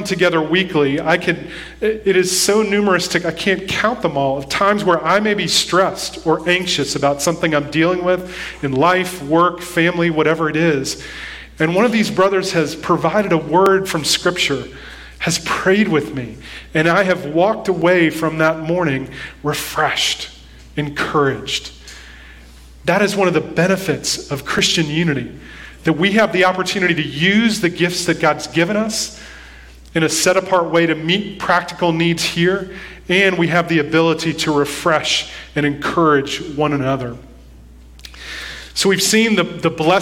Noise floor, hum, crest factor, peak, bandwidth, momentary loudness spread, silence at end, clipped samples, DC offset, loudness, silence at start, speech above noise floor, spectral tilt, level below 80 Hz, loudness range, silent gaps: -40 dBFS; none; 16 dB; 0 dBFS; 16.5 kHz; 11 LU; 0 s; under 0.1%; under 0.1%; -16 LUFS; 0 s; 24 dB; -4 dB/octave; -44 dBFS; 3 LU; none